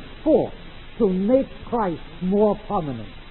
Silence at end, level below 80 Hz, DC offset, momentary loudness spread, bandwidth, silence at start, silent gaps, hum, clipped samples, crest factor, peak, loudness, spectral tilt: 0 s; -44 dBFS; under 0.1%; 12 LU; 4.2 kHz; 0 s; none; none; under 0.1%; 16 dB; -6 dBFS; -23 LUFS; -12.5 dB/octave